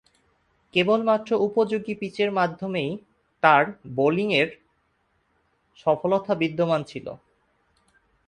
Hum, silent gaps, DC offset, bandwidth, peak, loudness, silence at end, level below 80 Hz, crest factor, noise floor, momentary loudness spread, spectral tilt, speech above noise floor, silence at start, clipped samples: none; none; under 0.1%; 9.8 kHz; -2 dBFS; -23 LUFS; 1.1 s; -64 dBFS; 24 dB; -69 dBFS; 10 LU; -6.5 dB/octave; 46 dB; 0.75 s; under 0.1%